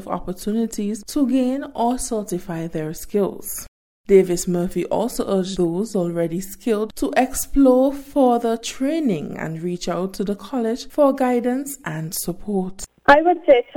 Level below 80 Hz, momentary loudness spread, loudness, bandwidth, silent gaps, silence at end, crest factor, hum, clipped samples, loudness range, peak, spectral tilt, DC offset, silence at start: -42 dBFS; 12 LU; -21 LUFS; 18 kHz; 3.68-4.04 s; 0 s; 20 dB; none; under 0.1%; 3 LU; 0 dBFS; -5.5 dB/octave; under 0.1%; 0 s